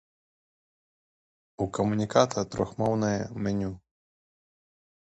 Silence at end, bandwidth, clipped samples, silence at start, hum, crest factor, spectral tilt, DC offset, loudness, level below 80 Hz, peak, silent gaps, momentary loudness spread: 1.25 s; 8.4 kHz; under 0.1%; 1.6 s; none; 24 dB; -6 dB/octave; under 0.1%; -28 LUFS; -56 dBFS; -8 dBFS; none; 10 LU